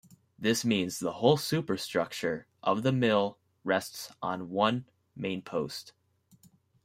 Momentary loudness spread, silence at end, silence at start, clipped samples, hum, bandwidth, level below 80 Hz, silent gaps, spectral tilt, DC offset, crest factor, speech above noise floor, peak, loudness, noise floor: 11 LU; 0.95 s; 0.4 s; under 0.1%; none; 16 kHz; -70 dBFS; none; -5 dB/octave; under 0.1%; 22 dB; 33 dB; -8 dBFS; -30 LUFS; -63 dBFS